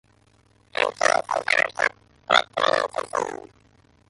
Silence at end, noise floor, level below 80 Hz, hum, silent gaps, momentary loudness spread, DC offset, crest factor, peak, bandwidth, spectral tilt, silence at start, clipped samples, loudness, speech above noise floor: 0.75 s; -60 dBFS; -64 dBFS; none; none; 9 LU; under 0.1%; 24 dB; -2 dBFS; 11.5 kHz; -1 dB/octave; 0.8 s; under 0.1%; -23 LUFS; 36 dB